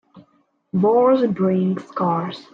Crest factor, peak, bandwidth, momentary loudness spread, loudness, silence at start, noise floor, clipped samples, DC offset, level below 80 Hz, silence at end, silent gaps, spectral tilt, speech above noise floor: 14 dB; -6 dBFS; 5.8 kHz; 8 LU; -19 LUFS; 0.15 s; -62 dBFS; under 0.1%; under 0.1%; -64 dBFS; 0.1 s; none; -9.5 dB/octave; 44 dB